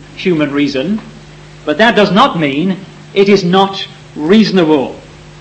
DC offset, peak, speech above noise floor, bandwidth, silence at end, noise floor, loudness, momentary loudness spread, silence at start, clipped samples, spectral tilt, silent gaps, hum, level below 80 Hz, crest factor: under 0.1%; 0 dBFS; 24 dB; 8.6 kHz; 0.05 s; -34 dBFS; -11 LUFS; 14 LU; 0 s; 0.2%; -6 dB/octave; none; none; -46 dBFS; 12 dB